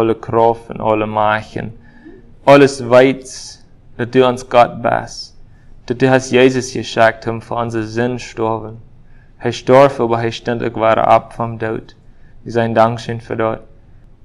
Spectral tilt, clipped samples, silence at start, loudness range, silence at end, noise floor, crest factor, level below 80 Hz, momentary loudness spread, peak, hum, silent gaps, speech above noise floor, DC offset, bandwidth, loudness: -6 dB/octave; 0.2%; 0 s; 3 LU; 0.65 s; -41 dBFS; 16 dB; -44 dBFS; 17 LU; 0 dBFS; none; none; 27 dB; under 0.1%; 12 kHz; -15 LUFS